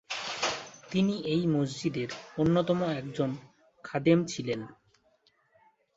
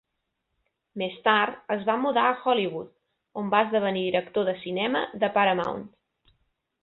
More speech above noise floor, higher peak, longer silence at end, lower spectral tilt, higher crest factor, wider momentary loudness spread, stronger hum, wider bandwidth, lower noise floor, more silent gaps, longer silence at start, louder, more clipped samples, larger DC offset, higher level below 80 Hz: second, 40 dB vs 55 dB; second, -10 dBFS vs -6 dBFS; first, 1.25 s vs 0.95 s; second, -6 dB/octave vs -7.5 dB/octave; about the same, 20 dB vs 22 dB; about the same, 11 LU vs 12 LU; neither; first, 8 kHz vs 4.9 kHz; second, -69 dBFS vs -80 dBFS; neither; second, 0.1 s vs 0.95 s; second, -30 LUFS vs -25 LUFS; neither; neither; first, -62 dBFS vs -68 dBFS